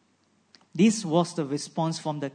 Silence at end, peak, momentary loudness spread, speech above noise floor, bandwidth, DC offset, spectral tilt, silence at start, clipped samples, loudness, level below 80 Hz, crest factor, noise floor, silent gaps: 0.05 s; -10 dBFS; 8 LU; 41 dB; 9.6 kHz; under 0.1%; -5.5 dB/octave; 0.75 s; under 0.1%; -26 LUFS; -78 dBFS; 18 dB; -67 dBFS; none